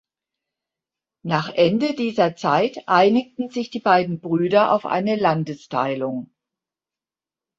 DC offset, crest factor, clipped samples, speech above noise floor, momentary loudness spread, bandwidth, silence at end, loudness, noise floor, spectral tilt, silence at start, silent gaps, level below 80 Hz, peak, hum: under 0.1%; 18 dB; under 0.1%; over 70 dB; 10 LU; 7.8 kHz; 1.35 s; -20 LUFS; under -90 dBFS; -6.5 dB/octave; 1.25 s; none; -64 dBFS; -4 dBFS; none